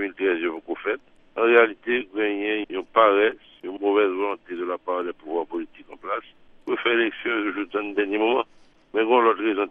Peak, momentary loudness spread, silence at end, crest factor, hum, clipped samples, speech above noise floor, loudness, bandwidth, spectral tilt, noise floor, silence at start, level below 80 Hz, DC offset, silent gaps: -2 dBFS; 14 LU; 0 s; 22 dB; none; under 0.1%; 32 dB; -23 LUFS; 3.8 kHz; -6.5 dB/octave; -54 dBFS; 0 s; -64 dBFS; under 0.1%; none